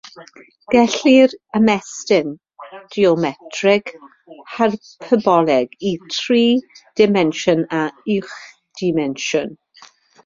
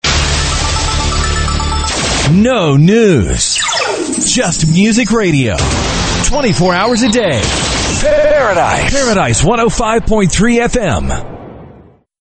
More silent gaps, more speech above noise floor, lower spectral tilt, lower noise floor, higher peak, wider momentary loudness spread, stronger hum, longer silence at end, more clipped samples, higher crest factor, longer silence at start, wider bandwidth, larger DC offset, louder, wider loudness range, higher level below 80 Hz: neither; about the same, 31 dB vs 30 dB; about the same, -5 dB/octave vs -4 dB/octave; first, -48 dBFS vs -40 dBFS; about the same, -2 dBFS vs 0 dBFS; first, 17 LU vs 5 LU; neither; first, 0.7 s vs 0.5 s; neither; about the same, 16 dB vs 12 dB; about the same, 0.15 s vs 0.05 s; second, 7.6 kHz vs 9.2 kHz; neither; second, -17 LUFS vs -11 LUFS; about the same, 3 LU vs 1 LU; second, -60 dBFS vs -22 dBFS